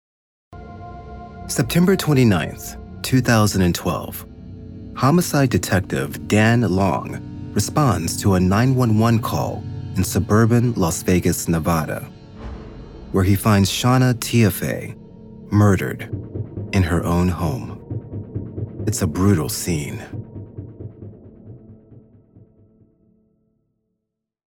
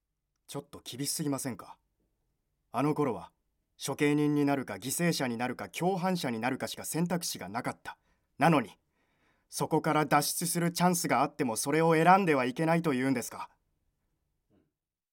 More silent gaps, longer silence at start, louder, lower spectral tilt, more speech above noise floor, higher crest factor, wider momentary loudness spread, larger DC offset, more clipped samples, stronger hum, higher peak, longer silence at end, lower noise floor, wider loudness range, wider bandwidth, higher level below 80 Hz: neither; about the same, 0.5 s vs 0.5 s; first, -19 LUFS vs -30 LUFS; about the same, -6 dB/octave vs -5 dB/octave; first, 61 dB vs 53 dB; second, 16 dB vs 22 dB; first, 21 LU vs 15 LU; neither; neither; neither; first, -4 dBFS vs -10 dBFS; first, 2.55 s vs 1.65 s; about the same, -79 dBFS vs -82 dBFS; about the same, 6 LU vs 7 LU; about the same, 18 kHz vs 17 kHz; first, -42 dBFS vs -74 dBFS